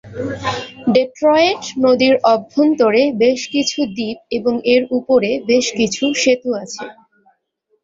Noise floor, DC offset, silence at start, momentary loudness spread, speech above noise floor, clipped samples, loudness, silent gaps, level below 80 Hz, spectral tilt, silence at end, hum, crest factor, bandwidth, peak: -65 dBFS; under 0.1%; 0.05 s; 10 LU; 50 dB; under 0.1%; -16 LUFS; none; -54 dBFS; -4 dB/octave; 0.9 s; none; 14 dB; 7.8 kHz; -2 dBFS